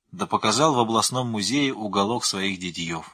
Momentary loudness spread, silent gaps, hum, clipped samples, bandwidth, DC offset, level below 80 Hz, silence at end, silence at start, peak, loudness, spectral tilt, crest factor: 8 LU; none; none; under 0.1%; 15.5 kHz; under 0.1%; -58 dBFS; 0.05 s; 0.15 s; -4 dBFS; -23 LUFS; -3.5 dB/octave; 18 dB